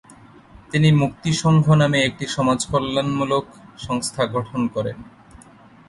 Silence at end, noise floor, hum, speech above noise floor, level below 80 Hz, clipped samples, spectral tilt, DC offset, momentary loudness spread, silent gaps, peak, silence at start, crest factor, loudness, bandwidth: 0.8 s; -47 dBFS; none; 28 dB; -48 dBFS; under 0.1%; -5.5 dB/octave; under 0.1%; 11 LU; none; -4 dBFS; 0.7 s; 16 dB; -20 LUFS; 11.5 kHz